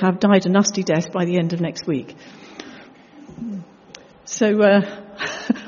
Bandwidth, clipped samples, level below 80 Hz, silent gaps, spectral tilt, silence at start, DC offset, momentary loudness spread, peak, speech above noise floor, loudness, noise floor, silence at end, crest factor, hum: 7.2 kHz; under 0.1%; -62 dBFS; none; -5.5 dB/octave; 0 s; under 0.1%; 23 LU; -4 dBFS; 26 dB; -19 LUFS; -45 dBFS; 0 s; 18 dB; none